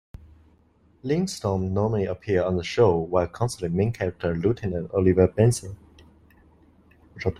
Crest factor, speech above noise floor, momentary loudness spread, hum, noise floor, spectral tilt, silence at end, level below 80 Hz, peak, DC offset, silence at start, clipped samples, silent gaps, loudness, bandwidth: 22 dB; 37 dB; 8 LU; none; -60 dBFS; -7 dB/octave; 0.05 s; -50 dBFS; -4 dBFS; under 0.1%; 1.05 s; under 0.1%; none; -24 LUFS; 13.5 kHz